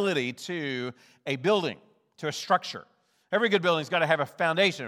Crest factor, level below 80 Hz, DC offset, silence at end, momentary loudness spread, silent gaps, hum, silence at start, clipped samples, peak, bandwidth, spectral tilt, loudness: 20 dB; -80 dBFS; under 0.1%; 0 s; 14 LU; none; none; 0 s; under 0.1%; -8 dBFS; 15 kHz; -4.5 dB/octave; -27 LUFS